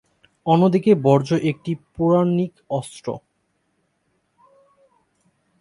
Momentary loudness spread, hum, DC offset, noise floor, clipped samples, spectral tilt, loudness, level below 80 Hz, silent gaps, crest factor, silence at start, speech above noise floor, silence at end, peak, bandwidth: 15 LU; none; under 0.1%; -70 dBFS; under 0.1%; -8 dB/octave; -20 LUFS; -58 dBFS; none; 20 dB; 0.45 s; 51 dB; 2.45 s; -2 dBFS; 11.5 kHz